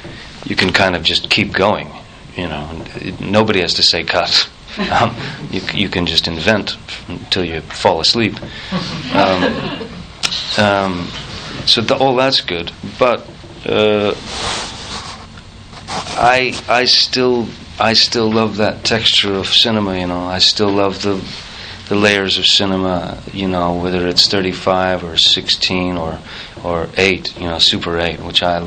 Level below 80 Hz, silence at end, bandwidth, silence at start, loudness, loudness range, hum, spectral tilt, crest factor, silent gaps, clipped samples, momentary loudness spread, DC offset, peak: -40 dBFS; 0 s; 14.5 kHz; 0 s; -14 LUFS; 4 LU; none; -3.5 dB/octave; 16 dB; none; under 0.1%; 15 LU; under 0.1%; 0 dBFS